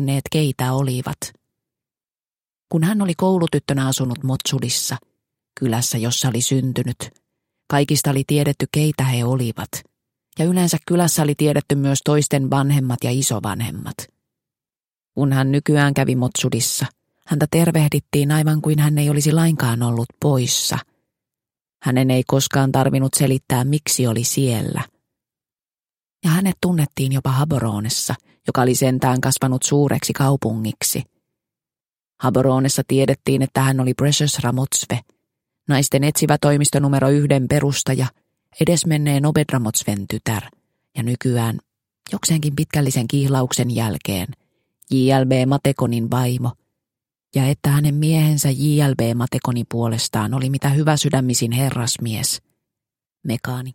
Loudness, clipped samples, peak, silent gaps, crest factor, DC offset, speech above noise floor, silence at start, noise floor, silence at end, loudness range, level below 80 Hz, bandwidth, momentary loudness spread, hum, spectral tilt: -19 LUFS; under 0.1%; -2 dBFS; none; 18 dB; under 0.1%; over 72 dB; 0 s; under -90 dBFS; 0 s; 4 LU; -52 dBFS; 17 kHz; 9 LU; none; -5 dB/octave